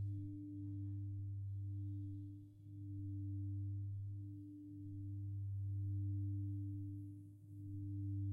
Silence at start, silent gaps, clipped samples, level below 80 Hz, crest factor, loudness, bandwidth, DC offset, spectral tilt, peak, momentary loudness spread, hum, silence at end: 0 s; none; under 0.1%; -72 dBFS; 10 dB; -47 LUFS; 0.6 kHz; under 0.1%; -12 dB/octave; -36 dBFS; 11 LU; none; 0 s